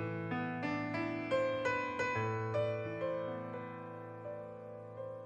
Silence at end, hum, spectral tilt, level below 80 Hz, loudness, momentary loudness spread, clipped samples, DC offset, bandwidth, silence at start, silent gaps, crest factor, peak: 0 s; none; -6.5 dB/octave; -72 dBFS; -38 LUFS; 12 LU; under 0.1%; under 0.1%; 8.6 kHz; 0 s; none; 14 dB; -24 dBFS